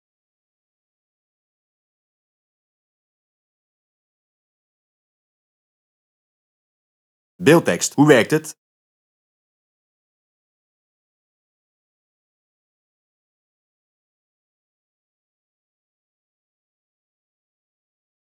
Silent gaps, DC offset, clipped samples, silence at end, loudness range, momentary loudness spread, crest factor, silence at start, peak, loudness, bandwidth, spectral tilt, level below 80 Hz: none; under 0.1%; under 0.1%; 9.85 s; 4 LU; 9 LU; 26 dB; 7.4 s; 0 dBFS; -16 LUFS; 18.5 kHz; -5 dB/octave; -78 dBFS